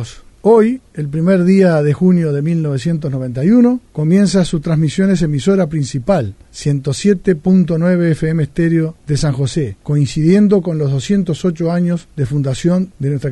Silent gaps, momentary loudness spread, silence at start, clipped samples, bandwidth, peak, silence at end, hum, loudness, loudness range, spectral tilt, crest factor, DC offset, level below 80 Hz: none; 8 LU; 0 s; under 0.1%; 11 kHz; 0 dBFS; 0 s; none; -14 LUFS; 2 LU; -7.5 dB/octave; 14 dB; under 0.1%; -40 dBFS